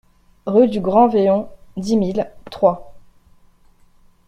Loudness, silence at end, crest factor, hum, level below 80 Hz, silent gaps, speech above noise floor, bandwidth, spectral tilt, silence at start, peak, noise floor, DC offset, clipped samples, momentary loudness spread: -17 LUFS; 1.3 s; 18 dB; none; -50 dBFS; none; 35 dB; 10.5 kHz; -7.5 dB/octave; 0.45 s; -2 dBFS; -51 dBFS; under 0.1%; under 0.1%; 16 LU